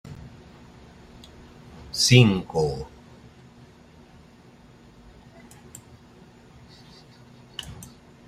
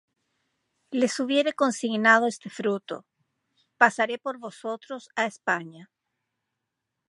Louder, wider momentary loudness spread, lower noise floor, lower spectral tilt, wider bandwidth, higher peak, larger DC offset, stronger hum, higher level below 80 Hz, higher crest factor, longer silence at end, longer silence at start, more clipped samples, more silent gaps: first, -21 LUFS vs -25 LUFS; first, 31 LU vs 16 LU; second, -51 dBFS vs -83 dBFS; about the same, -4.5 dB/octave vs -3.5 dB/octave; first, 14 kHz vs 11.5 kHz; about the same, -2 dBFS vs -2 dBFS; neither; neither; first, -52 dBFS vs -82 dBFS; about the same, 26 dB vs 26 dB; second, 0.45 s vs 1.25 s; second, 0.05 s vs 0.9 s; neither; neither